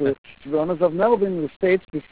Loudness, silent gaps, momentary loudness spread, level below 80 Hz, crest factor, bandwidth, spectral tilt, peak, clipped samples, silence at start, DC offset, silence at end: -21 LUFS; 0.18-0.24 s, 1.56-1.60 s; 6 LU; -56 dBFS; 16 dB; 4 kHz; -11 dB/octave; -6 dBFS; under 0.1%; 0 s; 0.3%; 0.1 s